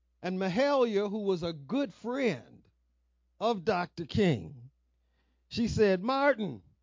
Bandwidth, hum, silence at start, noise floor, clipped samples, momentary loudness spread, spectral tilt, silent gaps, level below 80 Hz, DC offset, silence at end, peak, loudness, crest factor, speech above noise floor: 7.6 kHz; none; 0.2 s; -73 dBFS; under 0.1%; 9 LU; -6.5 dB/octave; none; -56 dBFS; under 0.1%; 0.25 s; -14 dBFS; -30 LUFS; 18 dB; 44 dB